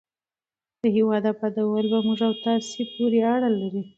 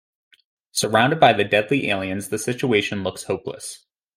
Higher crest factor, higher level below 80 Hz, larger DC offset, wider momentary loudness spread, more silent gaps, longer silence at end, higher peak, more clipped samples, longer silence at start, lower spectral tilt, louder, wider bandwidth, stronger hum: second, 14 dB vs 20 dB; second, -72 dBFS vs -62 dBFS; neither; second, 5 LU vs 12 LU; neither; second, 0.1 s vs 0.4 s; second, -10 dBFS vs -2 dBFS; neither; about the same, 0.85 s vs 0.75 s; first, -6 dB/octave vs -4 dB/octave; second, -23 LUFS vs -20 LUFS; second, 7.8 kHz vs 16 kHz; neither